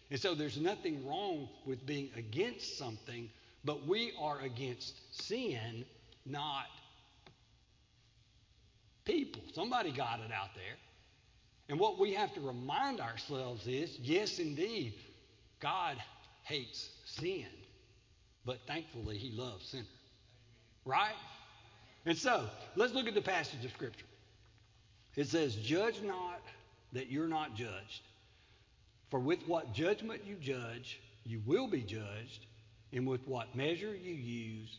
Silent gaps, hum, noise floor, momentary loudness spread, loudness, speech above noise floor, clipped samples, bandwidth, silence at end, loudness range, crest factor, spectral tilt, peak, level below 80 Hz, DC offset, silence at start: none; none; -69 dBFS; 15 LU; -39 LUFS; 30 dB; under 0.1%; 7.6 kHz; 0 s; 7 LU; 22 dB; -5 dB/octave; -18 dBFS; -68 dBFS; under 0.1%; 0.1 s